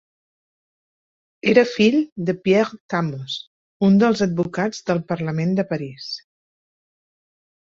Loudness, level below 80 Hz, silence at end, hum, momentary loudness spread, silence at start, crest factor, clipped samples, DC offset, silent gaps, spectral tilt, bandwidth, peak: -20 LUFS; -62 dBFS; 1.6 s; none; 14 LU; 1.45 s; 20 dB; under 0.1%; under 0.1%; 2.12-2.16 s, 2.80-2.89 s, 3.47-3.80 s; -6.5 dB/octave; 7.6 kHz; -2 dBFS